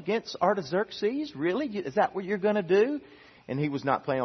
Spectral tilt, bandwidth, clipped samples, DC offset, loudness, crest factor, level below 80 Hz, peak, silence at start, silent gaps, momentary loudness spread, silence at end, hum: -6.5 dB/octave; 6.4 kHz; under 0.1%; under 0.1%; -28 LUFS; 18 dB; -70 dBFS; -10 dBFS; 0 s; none; 6 LU; 0 s; none